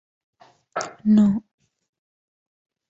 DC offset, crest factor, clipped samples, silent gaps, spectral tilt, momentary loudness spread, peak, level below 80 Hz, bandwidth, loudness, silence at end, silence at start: under 0.1%; 18 dB; under 0.1%; none; -7 dB/octave; 14 LU; -8 dBFS; -62 dBFS; 7.8 kHz; -21 LUFS; 1.5 s; 0.75 s